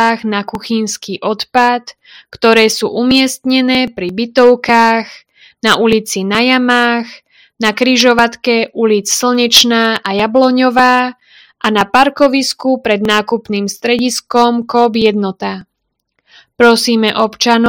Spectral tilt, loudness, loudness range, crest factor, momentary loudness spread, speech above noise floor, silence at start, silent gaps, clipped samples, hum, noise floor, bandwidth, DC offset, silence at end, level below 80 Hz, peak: -3 dB/octave; -12 LUFS; 3 LU; 12 dB; 10 LU; 59 dB; 0 s; none; 0.7%; none; -71 dBFS; over 20 kHz; under 0.1%; 0 s; -50 dBFS; 0 dBFS